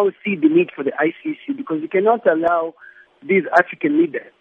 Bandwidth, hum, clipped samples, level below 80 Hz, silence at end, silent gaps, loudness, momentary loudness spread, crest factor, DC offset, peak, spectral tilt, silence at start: 6 kHz; none; under 0.1%; -70 dBFS; 0.2 s; none; -18 LUFS; 11 LU; 18 dB; under 0.1%; 0 dBFS; -8 dB/octave; 0 s